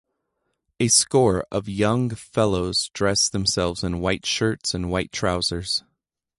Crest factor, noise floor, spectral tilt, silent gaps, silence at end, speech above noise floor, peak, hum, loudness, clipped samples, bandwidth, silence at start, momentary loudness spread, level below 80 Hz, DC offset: 20 dB; -76 dBFS; -3.5 dB/octave; none; 0.6 s; 54 dB; -4 dBFS; none; -22 LUFS; under 0.1%; 11.5 kHz; 0.8 s; 8 LU; -44 dBFS; under 0.1%